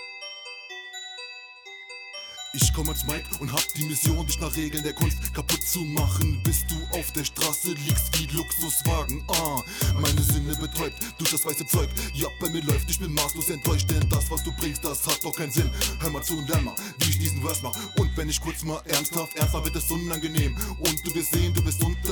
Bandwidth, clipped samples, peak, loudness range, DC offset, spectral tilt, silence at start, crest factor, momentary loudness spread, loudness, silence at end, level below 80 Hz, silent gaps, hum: over 20 kHz; under 0.1%; -8 dBFS; 2 LU; under 0.1%; -3.5 dB/octave; 0 s; 18 dB; 11 LU; -25 LUFS; 0 s; -34 dBFS; none; none